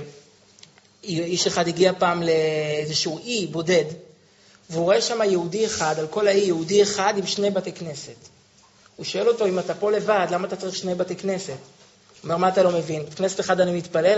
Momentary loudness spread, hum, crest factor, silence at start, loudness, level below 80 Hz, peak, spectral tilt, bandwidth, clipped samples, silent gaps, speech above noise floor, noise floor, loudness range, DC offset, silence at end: 13 LU; none; 18 dB; 0 s; -22 LUFS; -64 dBFS; -4 dBFS; -3.5 dB/octave; 8 kHz; under 0.1%; none; 33 dB; -55 dBFS; 3 LU; under 0.1%; 0 s